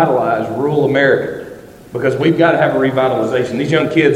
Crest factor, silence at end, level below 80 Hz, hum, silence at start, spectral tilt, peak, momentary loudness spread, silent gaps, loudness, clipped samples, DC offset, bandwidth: 14 dB; 0 s; -50 dBFS; none; 0 s; -7 dB/octave; 0 dBFS; 10 LU; none; -14 LUFS; under 0.1%; under 0.1%; 15 kHz